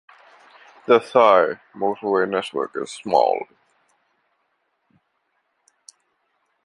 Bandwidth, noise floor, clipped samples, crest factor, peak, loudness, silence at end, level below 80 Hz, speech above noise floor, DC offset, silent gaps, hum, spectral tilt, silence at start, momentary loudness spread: 11 kHz; -71 dBFS; under 0.1%; 22 dB; -2 dBFS; -20 LUFS; 3.2 s; -72 dBFS; 52 dB; under 0.1%; none; none; -4.5 dB/octave; 0.9 s; 14 LU